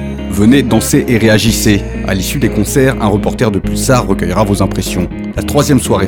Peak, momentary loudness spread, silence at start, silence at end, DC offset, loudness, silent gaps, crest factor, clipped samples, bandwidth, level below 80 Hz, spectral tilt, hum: 0 dBFS; 7 LU; 0 s; 0 s; under 0.1%; -12 LUFS; none; 12 dB; 0.1%; 19.5 kHz; -24 dBFS; -5.5 dB/octave; none